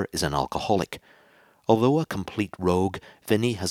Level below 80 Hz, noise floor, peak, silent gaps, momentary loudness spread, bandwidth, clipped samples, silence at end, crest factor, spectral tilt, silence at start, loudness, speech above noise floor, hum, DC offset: -52 dBFS; -58 dBFS; -4 dBFS; none; 13 LU; 17 kHz; under 0.1%; 0 s; 22 dB; -5.5 dB/octave; 0 s; -25 LUFS; 33 dB; none; under 0.1%